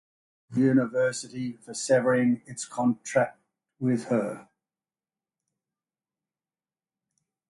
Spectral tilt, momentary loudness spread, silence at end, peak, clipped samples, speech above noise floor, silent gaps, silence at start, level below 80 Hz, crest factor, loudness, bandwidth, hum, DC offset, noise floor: -5.5 dB/octave; 12 LU; 3.1 s; -10 dBFS; under 0.1%; over 64 dB; none; 0.5 s; -72 dBFS; 20 dB; -27 LUFS; 11.5 kHz; none; under 0.1%; under -90 dBFS